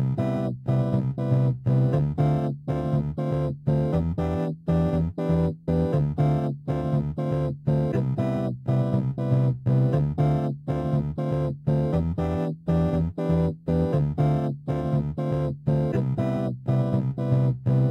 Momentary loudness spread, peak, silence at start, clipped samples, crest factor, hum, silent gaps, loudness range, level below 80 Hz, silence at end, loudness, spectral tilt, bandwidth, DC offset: 4 LU; -10 dBFS; 0 s; under 0.1%; 14 dB; none; none; 1 LU; -42 dBFS; 0 s; -25 LUFS; -10.5 dB/octave; 5.8 kHz; under 0.1%